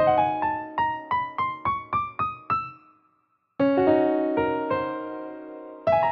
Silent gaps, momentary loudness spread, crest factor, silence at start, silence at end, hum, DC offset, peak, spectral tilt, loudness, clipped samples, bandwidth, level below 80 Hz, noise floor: none; 15 LU; 16 dB; 0 s; 0 s; none; under 0.1%; -8 dBFS; -8.5 dB/octave; -25 LUFS; under 0.1%; 5.8 kHz; -58 dBFS; -69 dBFS